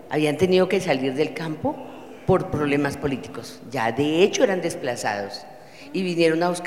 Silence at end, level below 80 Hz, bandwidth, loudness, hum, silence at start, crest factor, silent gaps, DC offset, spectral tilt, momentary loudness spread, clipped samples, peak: 0 s; -52 dBFS; 15.5 kHz; -23 LUFS; none; 0 s; 20 dB; none; 0.3%; -5.5 dB/octave; 16 LU; under 0.1%; -4 dBFS